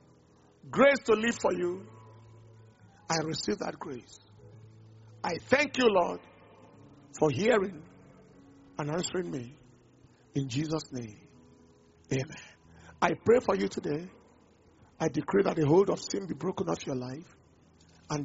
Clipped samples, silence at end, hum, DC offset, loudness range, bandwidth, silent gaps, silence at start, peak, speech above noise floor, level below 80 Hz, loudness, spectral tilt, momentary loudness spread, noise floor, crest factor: under 0.1%; 0 s; none; under 0.1%; 8 LU; 8 kHz; none; 0.65 s; -8 dBFS; 32 dB; -64 dBFS; -29 LUFS; -4.5 dB/octave; 18 LU; -61 dBFS; 24 dB